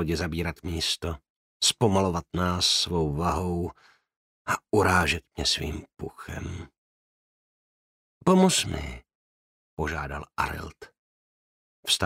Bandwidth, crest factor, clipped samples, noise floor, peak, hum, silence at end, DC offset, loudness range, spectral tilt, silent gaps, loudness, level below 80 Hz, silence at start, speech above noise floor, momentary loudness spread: 16 kHz; 22 dB; under 0.1%; under -90 dBFS; -6 dBFS; none; 0 s; under 0.1%; 6 LU; -4 dB/octave; 1.30-1.60 s, 4.16-4.45 s, 6.78-8.21 s, 9.15-9.77 s, 10.99-11.83 s; -26 LUFS; -44 dBFS; 0 s; over 63 dB; 17 LU